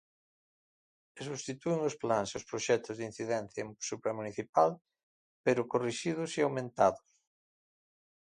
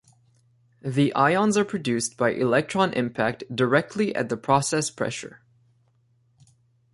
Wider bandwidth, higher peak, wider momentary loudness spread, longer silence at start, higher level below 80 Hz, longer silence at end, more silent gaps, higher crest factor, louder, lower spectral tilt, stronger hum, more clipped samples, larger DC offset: about the same, 11 kHz vs 11.5 kHz; second, -12 dBFS vs -6 dBFS; about the same, 11 LU vs 9 LU; first, 1.15 s vs 0.85 s; second, -72 dBFS vs -62 dBFS; second, 1.3 s vs 1.55 s; first, 4.49-4.53 s, 5.03-5.44 s vs none; about the same, 24 dB vs 20 dB; second, -33 LUFS vs -24 LUFS; about the same, -4.5 dB/octave vs -5 dB/octave; neither; neither; neither